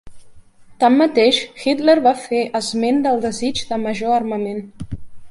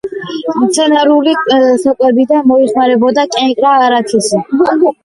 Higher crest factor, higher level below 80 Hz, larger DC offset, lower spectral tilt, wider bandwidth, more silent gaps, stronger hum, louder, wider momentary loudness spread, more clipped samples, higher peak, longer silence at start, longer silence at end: first, 16 dB vs 10 dB; first, -48 dBFS vs -54 dBFS; neither; about the same, -4.5 dB/octave vs -4 dB/octave; about the same, 11.5 kHz vs 11.5 kHz; neither; neither; second, -17 LUFS vs -10 LUFS; first, 15 LU vs 4 LU; neither; about the same, -2 dBFS vs 0 dBFS; about the same, 0.05 s vs 0.05 s; about the same, 0 s vs 0.1 s